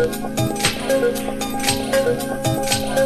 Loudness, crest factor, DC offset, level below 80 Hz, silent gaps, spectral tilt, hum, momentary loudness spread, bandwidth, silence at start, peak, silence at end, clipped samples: -20 LUFS; 16 dB; under 0.1%; -40 dBFS; none; -4 dB/octave; none; 4 LU; 14.5 kHz; 0 s; -4 dBFS; 0 s; under 0.1%